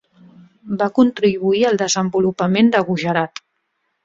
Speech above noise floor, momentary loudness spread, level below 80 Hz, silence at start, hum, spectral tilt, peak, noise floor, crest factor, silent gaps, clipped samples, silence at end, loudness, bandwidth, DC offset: 54 dB; 7 LU; -58 dBFS; 0.65 s; none; -5 dB/octave; -2 dBFS; -70 dBFS; 16 dB; none; under 0.1%; 0.8 s; -17 LUFS; 7.6 kHz; under 0.1%